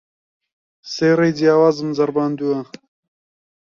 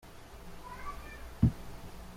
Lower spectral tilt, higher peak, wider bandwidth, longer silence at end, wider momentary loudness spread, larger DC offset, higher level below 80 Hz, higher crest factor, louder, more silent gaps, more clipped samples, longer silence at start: about the same, -6.5 dB/octave vs -7.5 dB/octave; first, -2 dBFS vs -14 dBFS; second, 7.2 kHz vs 16 kHz; first, 1.05 s vs 0 s; second, 12 LU vs 20 LU; neither; second, -64 dBFS vs -46 dBFS; second, 16 dB vs 24 dB; first, -17 LUFS vs -35 LUFS; neither; neither; first, 0.85 s vs 0.05 s